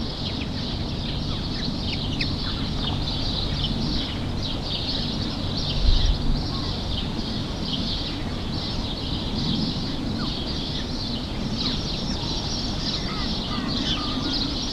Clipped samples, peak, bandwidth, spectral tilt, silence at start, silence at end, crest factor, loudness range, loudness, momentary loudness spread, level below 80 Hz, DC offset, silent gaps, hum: under 0.1%; -6 dBFS; 12 kHz; -5 dB/octave; 0 s; 0 s; 18 dB; 2 LU; -26 LUFS; 4 LU; -30 dBFS; under 0.1%; none; none